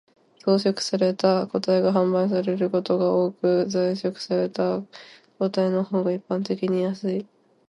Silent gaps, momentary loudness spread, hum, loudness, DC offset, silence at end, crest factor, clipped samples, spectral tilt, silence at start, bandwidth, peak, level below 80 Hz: none; 7 LU; none; -23 LUFS; under 0.1%; 0.45 s; 16 dB; under 0.1%; -6.5 dB/octave; 0.45 s; 11.5 kHz; -6 dBFS; -70 dBFS